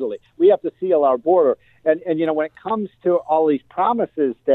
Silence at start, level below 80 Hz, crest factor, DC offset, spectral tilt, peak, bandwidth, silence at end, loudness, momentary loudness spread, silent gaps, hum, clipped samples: 0 s; -66 dBFS; 14 dB; under 0.1%; -9.5 dB/octave; -4 dBFS; 4.1 kHz; 0 s; -19 LUFS; 7 LU; none; none; under 0.1%